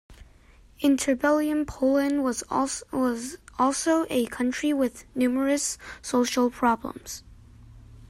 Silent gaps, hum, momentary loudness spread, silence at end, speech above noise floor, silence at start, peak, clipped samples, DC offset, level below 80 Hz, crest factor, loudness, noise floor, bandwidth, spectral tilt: none; none; 9 LU; 0.05 s; 29 dB; 0.1 s; -10 dBFS; under 0.1%; under 0.1%; -52 dBFS; 16 dB; -25 LUFS; -54 dBFS; 15.5 kHz; -3.5 dB/octave